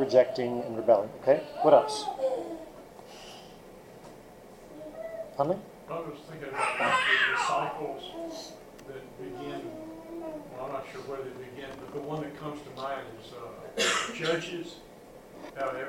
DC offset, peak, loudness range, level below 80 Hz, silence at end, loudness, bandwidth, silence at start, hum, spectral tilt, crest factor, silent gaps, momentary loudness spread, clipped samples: under 0.1%; -8 dBFS; 12 LU; -62 dBFS; 0 s; -30 LUFS; 16 kHz; 0 s; none; -3.5 dB/octave; 24 dB; none; 24 LU; under 0.1%